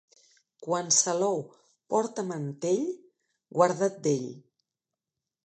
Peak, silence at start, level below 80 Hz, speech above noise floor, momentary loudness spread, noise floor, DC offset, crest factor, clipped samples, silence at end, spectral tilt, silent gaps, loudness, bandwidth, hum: -8 dBFS; 0.6 s; -82 dBFS; 62 dB; 15 LU; -89 dBFS; under 0.1%; 22 dB; under 0.1%; 1.05 s; -3.5 dB/octave; none; -28 LUFS; 9.4 kHz; none